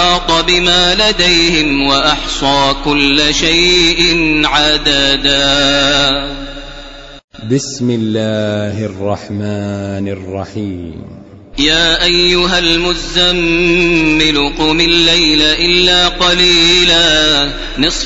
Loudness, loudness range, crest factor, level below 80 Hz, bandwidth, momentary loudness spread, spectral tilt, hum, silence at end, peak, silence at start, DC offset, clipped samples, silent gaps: -10 LUFS; 10 LU; 12 dB; -26 dBFS; 8 kHz; 13 LU; -3 dB/octave; none; 0 s; 0 dBFS; 0 s; under 0.1%; under 0.1%; 7.24-7.28 s